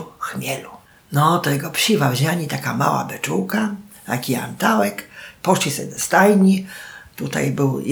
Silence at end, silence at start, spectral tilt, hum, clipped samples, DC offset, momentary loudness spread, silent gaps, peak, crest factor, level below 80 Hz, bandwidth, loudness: 0 s; 0 s; -5 dB/octave; none; under 0.1%; under 0.1%; 14 LU; none; -2 dBFS; 18 dB; -60 dBFS; over 20 kHz; -19 LUFS